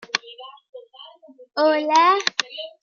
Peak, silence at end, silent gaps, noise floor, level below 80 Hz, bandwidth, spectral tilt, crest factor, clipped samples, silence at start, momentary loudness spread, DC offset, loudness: -2 dBFS; 0.15 s; 0.69-0.73 s; -46 dBFS; -80 dBFS; 7.4 kHz; -0.5 dB/octave; 22 dB; under 0.1%; 0.15 s; 25 LU; under 0.1%; -19 LUFS